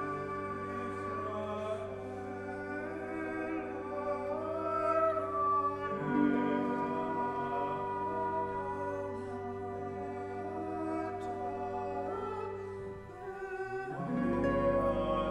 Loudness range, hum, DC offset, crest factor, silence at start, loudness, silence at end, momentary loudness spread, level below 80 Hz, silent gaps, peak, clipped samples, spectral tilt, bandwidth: 6 LU; none; under 0.1%; 18 dB; 0 s; -36 LUFS; 0 s; 10 LU; -56 dBFS; none; -18 dBFS; under 0.1%; -7.5 dB/octave; 11 kHz